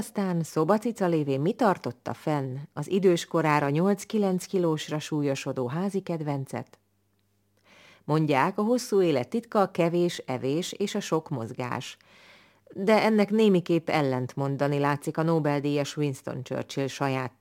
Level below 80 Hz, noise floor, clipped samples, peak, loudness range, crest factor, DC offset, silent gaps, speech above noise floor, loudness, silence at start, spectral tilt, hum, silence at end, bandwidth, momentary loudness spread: -74 dBFS; -71 dBFS; under 0.1%; -8 dBFS; 5 LU; 20 dB; under 0.1%; none; 44 dB; -27 LUFS; 0 s; -6 dB/octave; none; 0.1 s; 17 kHz; 10 LU